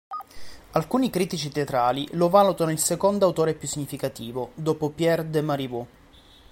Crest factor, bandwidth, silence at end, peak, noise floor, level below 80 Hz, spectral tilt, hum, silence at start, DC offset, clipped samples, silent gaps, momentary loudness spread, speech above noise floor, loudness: 20 dB; 17 kHz; 0.65 s; -4 dBFS; -52 dBFS; -56 dBFS; -5 dB/octave; none; 0.1 s; under 0.1%; under 0.1%; none; 13 LU; 28 dB; -24 LUFS